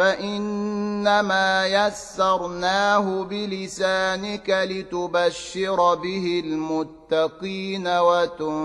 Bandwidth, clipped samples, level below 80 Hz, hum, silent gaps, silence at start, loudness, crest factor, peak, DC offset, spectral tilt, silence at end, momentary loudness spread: 12 kHz; under 0.1%; -56 dBFS; none; none; 0 s; -23 LUFS; 18 dB; -6 dBFS; under 0.1%; -4 dB/octave; 0 s; 8 LU